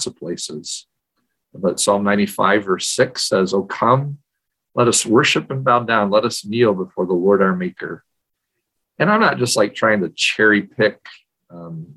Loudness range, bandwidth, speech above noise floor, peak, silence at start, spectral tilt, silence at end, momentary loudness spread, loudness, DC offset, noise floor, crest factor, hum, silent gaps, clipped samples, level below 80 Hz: 2 LU; 13 kHz; 60 dB; -2 dBFS; 0 s; -4 dB/octave; 0.05 s; 13 LU; -17 LUFS; under 0.1%; -78 dBFS; 18 dB; none; none; under 0.1%; -58 dBFS